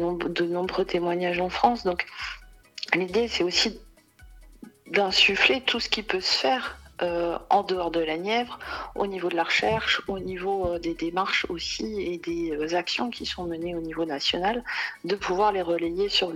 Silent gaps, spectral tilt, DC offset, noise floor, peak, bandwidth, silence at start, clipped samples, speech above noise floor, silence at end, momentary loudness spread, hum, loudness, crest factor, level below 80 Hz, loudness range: none; -3.5 dB/octave; under 0.1%; -51 dBFS; -6 dBFS; 15.5 kHz; 0 s; under 0.1%; 25 dB; 0 s; 9 LU; none; -26 LUFS; 22 dB; -50 dBFS; 5 LU